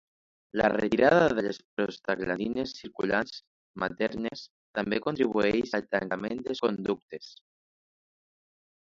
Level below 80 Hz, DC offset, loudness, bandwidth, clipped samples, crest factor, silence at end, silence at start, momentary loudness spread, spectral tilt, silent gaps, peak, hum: -60 dBFS; under 0.1%; -29 LUFS; 7.6 kHz; under 0.1%; 22 dB; 1.5 s; 0.55 s; 13 LU; -6 dB/octave; 1.65-1.77 s, 3.47-3.74 s, 4.50-4.73 s, 7.02-7.08 s; -8 dBFS; none